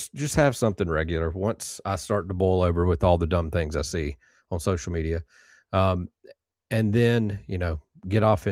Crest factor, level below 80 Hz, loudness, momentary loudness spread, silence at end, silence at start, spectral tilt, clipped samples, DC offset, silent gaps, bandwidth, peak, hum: 20 dB; -40 dBFS; -25 LUFS; 10 LU; 0 s; 0 s; -6.5 dB/octave; under 0.1%; under 0.1%; none; 15.5 kHz; -6 dBFS; none